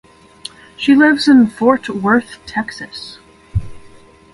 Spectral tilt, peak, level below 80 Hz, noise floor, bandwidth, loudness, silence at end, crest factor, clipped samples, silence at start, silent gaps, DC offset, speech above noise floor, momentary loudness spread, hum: -6 dB/octave; 0 dBFS; -38 dBFS; -42 dBFS; 11.5 kHz; -14 LUFS; 0.55 s; 16 dB; under 0.1%; 0.8 s; none; under 0.1%; 29 dB; 22 LU; none